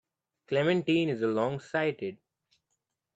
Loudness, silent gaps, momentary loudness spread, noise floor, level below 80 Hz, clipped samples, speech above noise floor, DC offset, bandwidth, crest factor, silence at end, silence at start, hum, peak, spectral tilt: -29 LUFS; none; 7 LU; -83 dBFS; -74 dBFS; under 0.1%; 54 dB; under 0.1%; 8 kHz; 18 dB; 1 s; 0.5 s; none; -14 dBFS; -7 dB/octave